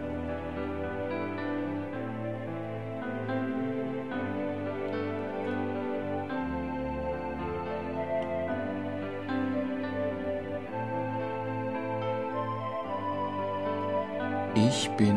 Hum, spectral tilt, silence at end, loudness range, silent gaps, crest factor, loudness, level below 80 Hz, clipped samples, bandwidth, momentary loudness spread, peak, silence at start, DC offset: none; -6 dB/octave; 0 s; 2 LU; none; 18 dB; -33 LUFS; -54 dBFS; under 0.1%; 11.5 kHz; 4 LU; -12 dBFS; 0 s; 0.3%